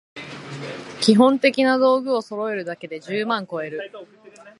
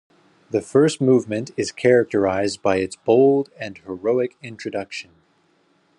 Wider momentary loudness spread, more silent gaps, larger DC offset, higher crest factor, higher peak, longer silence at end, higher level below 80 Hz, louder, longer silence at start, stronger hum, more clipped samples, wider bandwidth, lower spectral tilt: first, 19 LU vs 15 LU; neither; neither; about the same, 20 dB vs 18 dB; about the same, -2 dBFS vs -4 dBFS; second, 0.1 s vs 0.95 s; about the same, -72 dBFS vs -68 dBFS; about the same, -20 LUFS vs -20 LUFS; second, 0.15 s vs 0.5 s; neither; neither; about the same, 11.5 kHz vs 11 kHz; about the same, -5 dB/octave vs -6 dB/octave